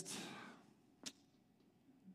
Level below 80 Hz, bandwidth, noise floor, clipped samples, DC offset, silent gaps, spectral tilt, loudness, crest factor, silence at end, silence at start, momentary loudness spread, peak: under -90 dBFS; 15.5 kHz; -73 dBFS; under 0.1%; under 0.1%; none; -2 dB/octave; -53 LUFS; 26 dB; 0 s; 0 s; 16 LU; -30 dBFS